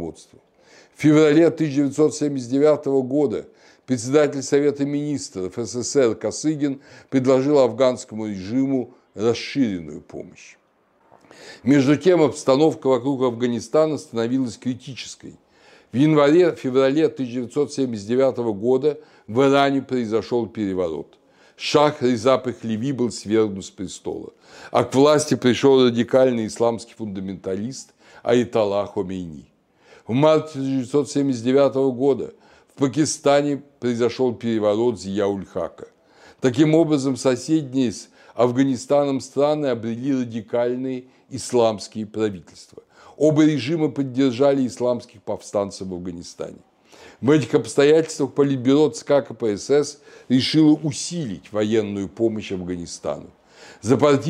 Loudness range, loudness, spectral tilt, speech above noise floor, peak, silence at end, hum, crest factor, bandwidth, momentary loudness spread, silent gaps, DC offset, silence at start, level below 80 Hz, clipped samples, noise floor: 4 LU; -20 LUFS; -6 dB/octave; 41 dB; -4 dBFS; 0 s; none; 18 dB; 11.5 kHz; 14 LU; none; under 0.1%; 0 s; -62 dBFS; under 0.1%; -61 dBFS